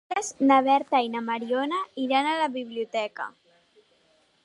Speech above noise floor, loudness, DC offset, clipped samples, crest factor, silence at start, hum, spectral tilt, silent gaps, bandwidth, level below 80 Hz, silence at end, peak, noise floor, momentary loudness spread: 40 dB; -25 LUFS; under 0.1%; under 0.1%; 18 dB; 0.1 s; none; -3 dB/octave; none; 11.5 kHz; -78 dBFS; 1.15 s; -8 dBFS; -65 dBFS; 12 LU